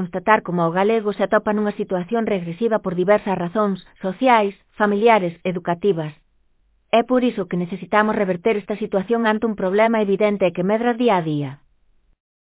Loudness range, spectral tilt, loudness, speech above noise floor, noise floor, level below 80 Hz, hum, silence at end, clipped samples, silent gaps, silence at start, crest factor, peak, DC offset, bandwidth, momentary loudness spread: 2 LU; -10.5 dB/octave; -20 LUFS; 42 dB; -61 dBFS; -58 dBFS; none; 0.9 s; under 0.1%; none; 0 s; 20 dB; 0 dBFS; under 0.1%; 4 kHz; 8 LU